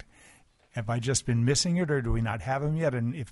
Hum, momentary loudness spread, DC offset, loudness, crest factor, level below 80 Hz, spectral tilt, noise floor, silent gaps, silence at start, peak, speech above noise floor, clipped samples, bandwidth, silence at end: none; 7 LU; under 0.1%; -28 LUFS; 16 dB; -42 dBFS; -5 dB/octave; -59 dBFS; none; 0.75 s; -12 dBFS; 32 dB; under 0.1%; 11.5 kHz; 0 s